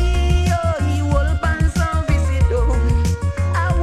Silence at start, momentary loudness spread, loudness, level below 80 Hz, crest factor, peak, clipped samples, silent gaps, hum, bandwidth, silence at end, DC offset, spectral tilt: 0 s; 2 LU; -18 LUFS; -20 dBFS; 12 dB; -4 dBFS; under 0.1%; none; none; 12.5 kHz; 0 s; under 0.1%; -6.5 dB/octave